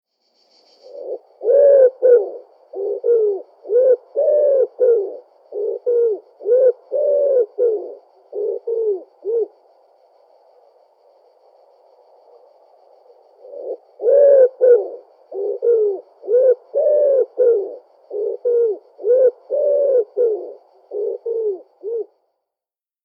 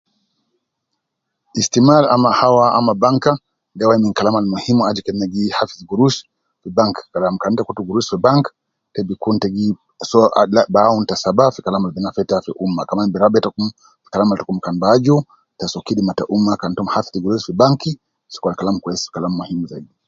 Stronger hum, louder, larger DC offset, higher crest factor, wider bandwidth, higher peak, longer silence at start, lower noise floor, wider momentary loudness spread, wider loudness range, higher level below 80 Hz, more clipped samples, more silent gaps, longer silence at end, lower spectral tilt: neither; about the same, -17 LUFS vs -17 LUFS; neither; about the same, 16 dB vs 16 dB; second, 1.8 kHz vs 7.8 kHz; about the same, -2 dBFS vs 0 dBFS; second, 0.9 s vs 1.55 s; first, -90 dBFS vs -76 dBFS; first, 19 LU vs 12 LU; first, 10 LU vs 5 LU; second, under -90 dBFS vs -52 dBFS; neither; neither; first, 1.05 s vs 0.25 s; about the same, -6.5 dB/octave vs -6 dB/octave